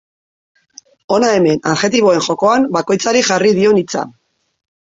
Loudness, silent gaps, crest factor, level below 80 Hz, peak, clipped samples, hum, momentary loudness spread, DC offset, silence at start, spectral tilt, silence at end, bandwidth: -13 LUFS; none; 14 dB; -56 dBFS; -2 dBFS; under 0.1%; none; 6 LU; under 0.1%; 1.1 s; -4 dB/octave; 0.85 s; 7.8 kHz